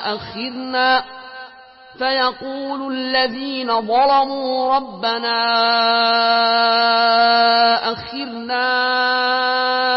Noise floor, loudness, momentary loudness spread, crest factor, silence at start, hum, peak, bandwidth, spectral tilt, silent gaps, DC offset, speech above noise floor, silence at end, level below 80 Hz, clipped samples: -42 dBFS; -17 LUFS; 13 LU; 14 dB; 0 s; none; -4 dBFS; 5.8 kHz; -7.5 dB/octave; none; under 0.1%; 25 dB; 0 s; -60 dBFS; under 0.1%